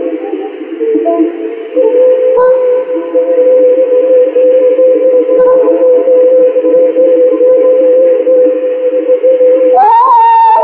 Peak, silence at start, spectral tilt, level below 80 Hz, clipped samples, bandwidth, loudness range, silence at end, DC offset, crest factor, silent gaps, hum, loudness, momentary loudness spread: 0 dBFS; 0 s; -9 dB/octave; -62 dBFS; under 0.1%; 3.9 kHz; 2 LU; 0 s; under 0.1%; 6 dB; none; none; -7 LUFS; 7 LU